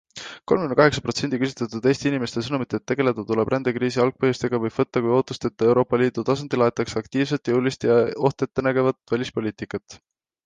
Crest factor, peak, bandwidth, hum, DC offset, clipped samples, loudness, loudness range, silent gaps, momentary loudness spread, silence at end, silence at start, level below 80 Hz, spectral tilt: 20 dB; -2 dBFS; 9.6 kHz; none; under 0.1%; under 0.1%; -22 LUFS; 2 LU; none; 8 LU; 0.5 s; 0.15 s; -54 dBFS; -6 dB/octave